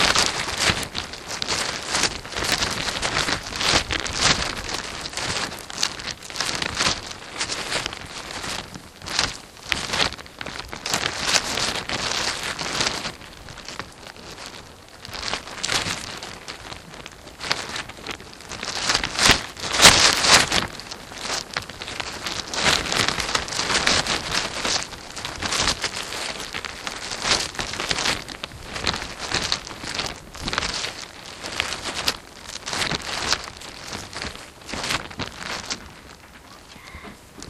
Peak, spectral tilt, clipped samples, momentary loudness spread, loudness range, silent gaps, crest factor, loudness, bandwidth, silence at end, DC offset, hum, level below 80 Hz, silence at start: 0 dBFS; -1 dB/octave; under 0.1%; 16 LU; 12 LU; none; 26 dB; -23 LUFS; 16 kHz; 0 s; under 0.1%; none; -44 dBFS; 0 s